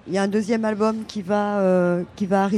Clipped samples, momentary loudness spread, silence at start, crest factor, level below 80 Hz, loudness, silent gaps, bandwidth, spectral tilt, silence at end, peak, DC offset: under 0.1%; 5 LU; 0.05 s; 12 dB; -60 dBFS; -22 LUFS; none; 11.5 kHz; -7 dB/octave; 0 s; -8 dBFS; under 0.1%